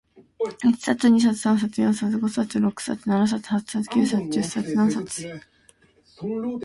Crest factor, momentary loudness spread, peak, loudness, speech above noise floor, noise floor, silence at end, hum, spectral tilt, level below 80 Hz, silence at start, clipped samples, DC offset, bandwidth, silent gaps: 16 dB; 12 LU; -6 dBFS; -23 LUFS; 35 dB; -58 dBFS; 0 s; none; -5.5 dB/octave; -62 dBFS; 0.15 s; under 0.1%; under 0.1%; 11.5 kHz; none